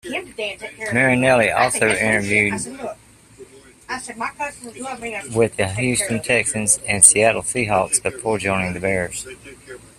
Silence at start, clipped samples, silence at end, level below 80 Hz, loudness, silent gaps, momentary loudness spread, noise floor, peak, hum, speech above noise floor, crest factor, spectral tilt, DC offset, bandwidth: 0.05 s; under 0.1%; 0.2 s; -50 dBFS; -18 LUFS; none; 15 LU; -45 dBFS; 0 dBFS; none; 25 dB; 20 dB; -3 dB/octave; under 0.1%; 15.5 kHz